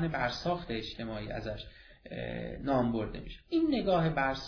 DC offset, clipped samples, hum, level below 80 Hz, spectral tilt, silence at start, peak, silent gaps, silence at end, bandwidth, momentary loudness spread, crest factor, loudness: under 0.1%; under 0.1%; none; -50 dBFS; -5 dB/octave; 0 s; -16 dBFS; none; 0 s; 5.4 kHz; 13 LU; 16 dB; -33 LUFS